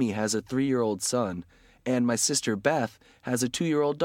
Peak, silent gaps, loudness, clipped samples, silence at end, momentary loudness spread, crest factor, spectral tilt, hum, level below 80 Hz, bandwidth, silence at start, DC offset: -10 dBFS; none; -27 LUFS; under 0.1%; 0 s; 10 LU; 18 dB; -4 dB/octave; none; -64 dBFS; 16.5 kHz; 0 s; under 0.1%